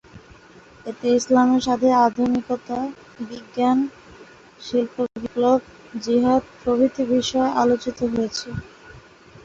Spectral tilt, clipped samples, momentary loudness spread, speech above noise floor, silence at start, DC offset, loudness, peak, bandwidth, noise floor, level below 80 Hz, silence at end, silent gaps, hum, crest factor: -5 dB/octave; under 0.1%; 17 LU; 27 dB; 0.15 s; under 0.1%; -21 LUFS; -4 dBFS; 7.8 kHz; -47 dBFS; -52 dBFS; 0.45 s; none; none; 16 dB